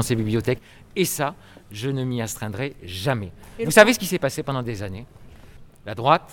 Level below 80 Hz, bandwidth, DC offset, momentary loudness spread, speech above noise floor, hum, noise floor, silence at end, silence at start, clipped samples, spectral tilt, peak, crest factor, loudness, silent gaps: -48 dBFS; 18.5 kHz; under 0.1%; 18 LU; 22 dB; none; -45 dBFS; 0 s; 0 s; under 0.1%; -4.5 dB/octave; 0 dBFS; 24 dB; -23 LUFS; none